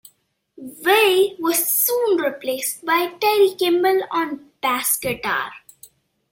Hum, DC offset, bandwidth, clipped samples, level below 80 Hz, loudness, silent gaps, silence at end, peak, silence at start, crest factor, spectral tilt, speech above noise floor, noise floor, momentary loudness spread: none; under 0.1%; 16.5 kHz; under 0.1%; -62 dBFS; -19 LUFS; none; 0.75 s; -2 dBFS; 0.6 s; 18 dB; -2 dB/octave; 42 dB; -61 dBFS; 9 LU